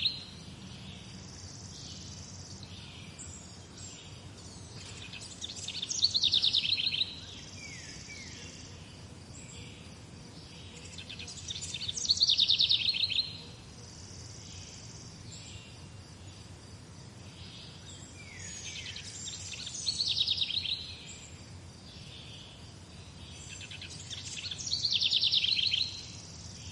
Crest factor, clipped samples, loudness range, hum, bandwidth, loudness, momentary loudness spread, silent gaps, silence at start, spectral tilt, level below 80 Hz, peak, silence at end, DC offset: 24 dB; under 0.1%; 18 LU; none; 11.5 kHz; -29 LUFS; 23 LU; none; 0 s; -1 dB/octave; -62 dBFS; -12 dBFS; 0 s; under 0.1%